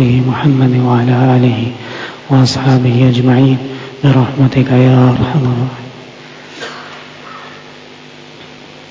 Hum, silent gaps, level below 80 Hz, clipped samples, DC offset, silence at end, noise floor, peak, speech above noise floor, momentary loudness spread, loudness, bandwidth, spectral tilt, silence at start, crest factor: none; none; -42 dBFS; under 0.1%; under 0.1%; 0.1 s; -34 dBFS; 0 dBFS; 25 dB; 22 LU; -11 LUFS; 7.8 kHz; -7.5 dB/octave; 0 s; 12 dB